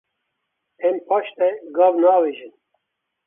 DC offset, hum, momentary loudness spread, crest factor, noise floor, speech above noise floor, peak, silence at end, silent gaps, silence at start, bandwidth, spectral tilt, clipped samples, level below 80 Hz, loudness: under 0.1%; none; 9 LU; 18 dB; -78 dBFS; 59 dB; -4 dBFS; 0.8 s; none; 0.8 s; 3.7 kHz; -9 dB/octave; under 0.1%; -80 dBFS; -19 LUFS